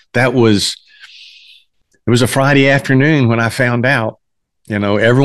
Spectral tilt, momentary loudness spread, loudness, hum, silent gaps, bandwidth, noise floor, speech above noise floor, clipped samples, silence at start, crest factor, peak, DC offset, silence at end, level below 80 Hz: -5.5 dB/octave; 10 LU; -13 LUFS; none; none; 12.5 kHz; -56 dBFS; 44 dB; under 0.1%; 0.15 s; 14 dB; 0 dBFS; under 0.1%; 0 s; -48 dBFS